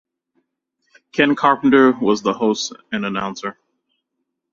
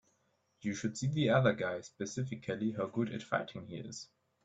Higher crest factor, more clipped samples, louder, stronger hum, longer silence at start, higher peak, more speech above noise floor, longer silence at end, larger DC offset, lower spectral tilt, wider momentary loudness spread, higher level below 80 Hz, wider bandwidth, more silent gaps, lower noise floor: about the same, 18 dB vs 20 dB; neither; first, -17 LUFS vs -35 LUFS; neither; first, 1.15 s vs 0.65 s; first, -2 dBFS vs -16 dBFS; first, 60 dB vs 41 dB; first, 1 s vs 0.4 s; neither; second, -4.5 dB/octave vs -6 dB/octave; about the same, 13 LU vs 15 LU; first, -60 dBFS vs -70 dBFS; second, 7.4 kHz vs 8.4 kHz; neither; about the same, -77 dBFS vs -76 dBFS